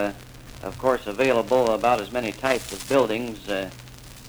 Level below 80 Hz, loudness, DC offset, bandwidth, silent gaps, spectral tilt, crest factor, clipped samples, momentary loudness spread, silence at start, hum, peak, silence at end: -48 dBFS; -24 LUFS; under 0.1%; over 20 kHz; none; -4.5 dB/octave; 20 dB; under 0.1%; 18 LU; 0 s; none; -6 dBFS; 0 s